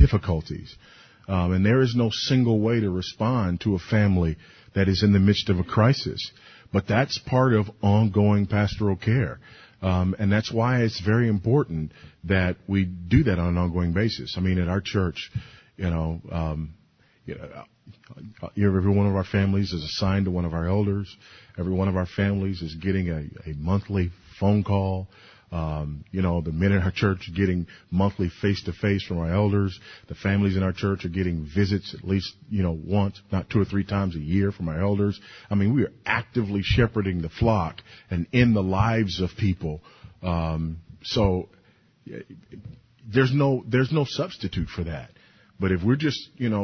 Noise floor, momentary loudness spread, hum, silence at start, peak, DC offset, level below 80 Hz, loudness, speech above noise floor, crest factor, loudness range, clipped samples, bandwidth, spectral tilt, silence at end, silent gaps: -59 dBFS; 13 LU; none; 0 s; -4 dBFS; under 0.1%; -36 dBFS; -24 LUFS; 36 dB; 20 dB; 5 LU; under 0.1%; 6.6 kHz; -7.5 dB/octave; 0 s; none